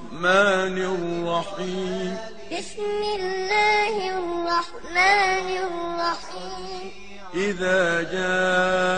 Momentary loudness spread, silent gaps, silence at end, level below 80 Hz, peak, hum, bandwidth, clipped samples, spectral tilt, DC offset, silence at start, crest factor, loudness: 15 LU; none; 0 s; -54 dBFS; -6 dBFS; none; 9.8 kHz; under 0.1%; -4 dB/octave; 1%; 0 s; 18 dB; -23 LUFS